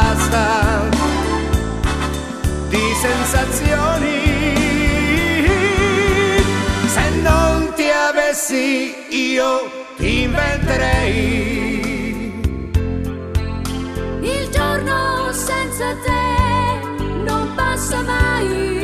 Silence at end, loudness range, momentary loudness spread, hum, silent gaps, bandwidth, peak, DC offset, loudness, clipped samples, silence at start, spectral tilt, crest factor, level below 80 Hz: 0 s; 5 LU; 8 LU; none; none; 14 kHz; -2 dBFS; under 0.1%; -17 LUFS; under 0.1%; 0 s; -4.5 dB/octave; 16 dB; -24 dBFS